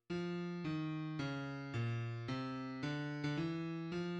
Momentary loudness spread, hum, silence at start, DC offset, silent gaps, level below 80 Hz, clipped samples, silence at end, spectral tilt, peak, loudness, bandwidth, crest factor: 2 LU; none; 0.1 s; under 0.1%; none; -70 dBFS; under 0.1%; 0 s; -7 dB/octave; -28 dBFS; -42 LUFS; 8.6 kHz; 14 dB